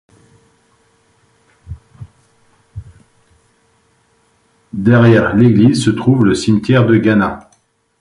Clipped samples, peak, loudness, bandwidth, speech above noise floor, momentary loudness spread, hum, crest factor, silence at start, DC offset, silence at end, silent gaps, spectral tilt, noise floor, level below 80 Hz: under 0.1%; 0 dBFS; -11 LUFS; 11.5 kHz; 47 dB; 26 LU; none; 16 dB; 1.7 s; under 0.1%; 0.6 s; none; -7 dB/octave; -57 dBFS; -42 dBFS